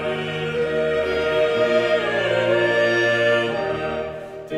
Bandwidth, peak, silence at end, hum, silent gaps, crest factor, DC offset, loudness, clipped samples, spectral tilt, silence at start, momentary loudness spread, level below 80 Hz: 11 kHz; -8 dBFS; 0 s; none; none; 14 dB; under 0.1%; -20 LUFS; under 0.1%; -5.5 dB/octave; 0 s; 8 LU; -50 dBFS